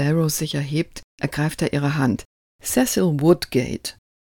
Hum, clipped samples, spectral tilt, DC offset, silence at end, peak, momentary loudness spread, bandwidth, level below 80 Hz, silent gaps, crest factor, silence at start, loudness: none; under 0.1%; -5.5 dB/octave; under 0.1%; 0.35 s; -4 dBFS; 12 LU; 18 kHz; -48 dBFS; 1.04-1.18 s, 2.25-2.59 s; 18 dB; 0 s; -22 LUFS